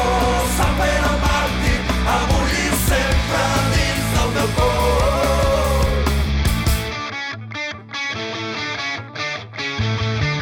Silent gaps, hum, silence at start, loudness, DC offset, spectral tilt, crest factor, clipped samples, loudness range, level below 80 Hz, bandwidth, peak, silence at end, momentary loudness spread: none; none; 0 s; -19 LUFS; under 0.1%; -4.5 dB/octave; 12 dB; under 0.1%; 6 LU; -24 dBFS; 18.5 kHz; -6 dBFS; 0 s; 8 LU